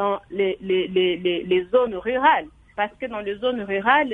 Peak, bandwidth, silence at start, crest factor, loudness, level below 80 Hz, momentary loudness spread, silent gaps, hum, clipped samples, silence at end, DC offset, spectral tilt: -2 dBFS; 3.9 kHz; 0 s; 20 dB; -22 LUFS; -54 dBFS; 9 LU; none; none; under 0.1%; 0 s; under 0.1%; -7 dB/octave